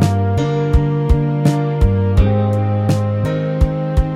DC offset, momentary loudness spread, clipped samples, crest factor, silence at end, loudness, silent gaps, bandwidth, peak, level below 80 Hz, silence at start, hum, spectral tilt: under 0.1%; 3 LU; under 0.1%; 14 dB; 0 s; -16 LUFS; none; 12 kHz; 0 dBFS; -20 dBFS; 0 s; none; -8.5 dB/octave